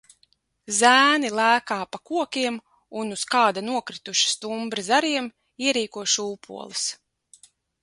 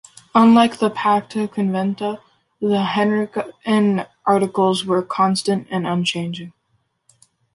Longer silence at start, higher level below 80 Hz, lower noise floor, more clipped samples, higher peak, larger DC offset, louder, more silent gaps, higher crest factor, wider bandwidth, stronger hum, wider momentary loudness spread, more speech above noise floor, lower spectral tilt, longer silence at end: first, 0.7 s vs 0.35 s; second, -72 dBFS vs -62 dBFS; about the same, -66 dBFS vs -67 dBFS; neither; about the same, -4 dBFS vs -2 dBFS; neither; second, -22 LUFS vs -19 LUFS; neither; about the same, 22 dB vs 18 dB; about the same, 11.5 kHz vs 11.5 kHz; neither; about the same, 14 LU vs 12 LU; second, 42 dB vs 49 dB; second, -1 dB/octave vs -6 dB/octave; second, 0.9 s vs 1.05 s